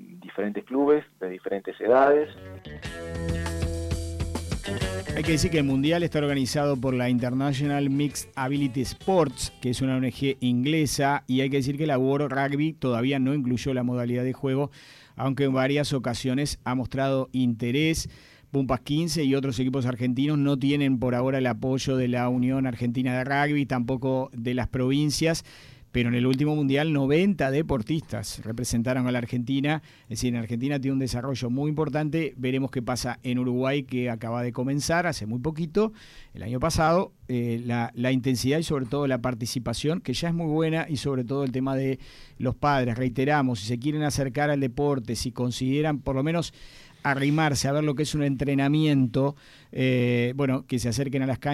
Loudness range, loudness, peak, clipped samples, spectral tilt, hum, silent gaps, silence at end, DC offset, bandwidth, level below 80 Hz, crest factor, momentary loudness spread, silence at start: 3 LU; -26 LUFS; -8 dBFS; under 0.1%; -6 dB/octave; none; none; 0 s; under 0.1%; 14.5 kHz; -46 dBFS; 18 dB; 7 LU; 0 s